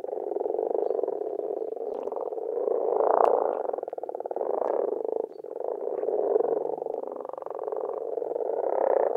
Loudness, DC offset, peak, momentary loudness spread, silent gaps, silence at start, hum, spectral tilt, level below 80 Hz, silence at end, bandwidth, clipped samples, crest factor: -29 LUFS; under 0.1%; -4 dBFS; 10 LU; none; 0.05 s; none; -7.5 dB/octave; -86 dBFS; 0 s; 3.1 kHz; under 0.1%; 24 dB